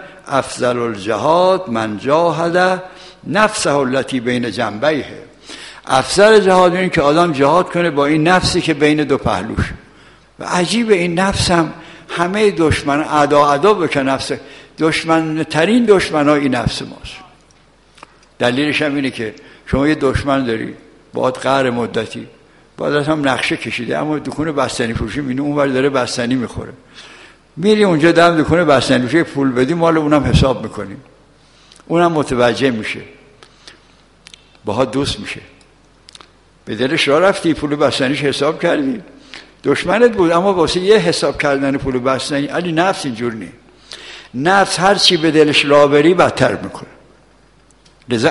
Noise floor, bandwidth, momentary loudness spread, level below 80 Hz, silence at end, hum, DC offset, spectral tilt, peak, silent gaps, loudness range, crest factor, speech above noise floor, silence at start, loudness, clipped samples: -50 dBFS; 11.5 kHz; 15 LU; -38 dBFS; 0 s; none; under 0.1%; -5 dB/octave; 0 dBFS; none; 6 LU; 16 dB; 35 dB; 0 s; -15 LUFS; under 0.1%